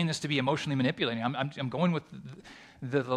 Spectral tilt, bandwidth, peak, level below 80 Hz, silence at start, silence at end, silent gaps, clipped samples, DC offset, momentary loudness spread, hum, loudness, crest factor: -5.5 dB/octave; 12 kHz; -14 dBFS; -68 dBFS; 0 s; 0 s; none; under 0.1%; under 0.1%; 18 LU; none; -30 LUFS; 16 dB